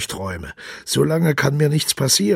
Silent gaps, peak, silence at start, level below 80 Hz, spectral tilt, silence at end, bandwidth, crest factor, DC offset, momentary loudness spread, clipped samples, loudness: none; -2 dBFS; 0 s; -48 dBFS; -4 dB/octave; 0 s; 16.5 kHz; 16 dB; under 0.1%; 15 LU; under 0.1%; -19 LUFS